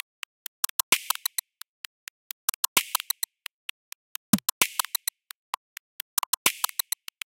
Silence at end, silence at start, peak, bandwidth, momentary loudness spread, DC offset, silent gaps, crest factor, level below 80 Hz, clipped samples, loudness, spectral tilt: 0.7 s; 0.9 s; -2 dBFS; 17.5 kHz; 18 LU; under 0.1%; 1.68-2.48 s, 2.56-2.76 s, 3.53-4.33 s, 4.52-4.61 s, 5.35-6.17 s, 6.26-6.45 s; 30 dB; -72 dBFS; under 0.1%; -27 LUFS; -1 dB/octave